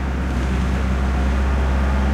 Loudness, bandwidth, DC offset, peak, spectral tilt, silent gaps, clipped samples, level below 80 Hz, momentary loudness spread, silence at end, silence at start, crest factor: -21 LUFS; 9 kHz; under 0.1%; -8 dBFS; -7 dB/octave; none; under 0.1%; -20 dBFS; 2 LU; 0 s; 0 s; 10 dB